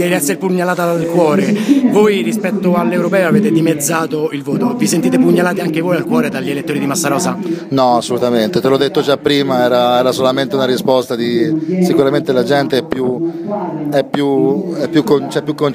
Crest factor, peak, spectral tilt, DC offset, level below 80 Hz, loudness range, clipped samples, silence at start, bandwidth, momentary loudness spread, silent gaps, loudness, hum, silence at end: 14 dB; 0 dBFS; -5.5 dB/octave; under 0.1%; -58 dBFS; 2 LU; under 0.1%; 0 s; 15.5 kHz; 6 LU; none; -14 LUFS; none; 0 s